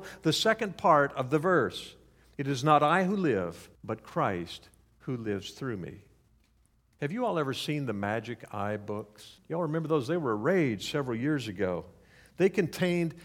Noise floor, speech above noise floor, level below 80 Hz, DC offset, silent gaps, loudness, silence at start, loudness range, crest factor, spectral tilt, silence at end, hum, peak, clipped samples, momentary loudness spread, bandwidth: -67 dBFS; 38 dB; -64 dBFS; under 0.1%; none; -30 LUFS; 0 s; 9 LU; 22 dB; -5.5 dB/octave; 0 s; none; -8 dBFS; under 0.1%; 15 LU; 17 kHz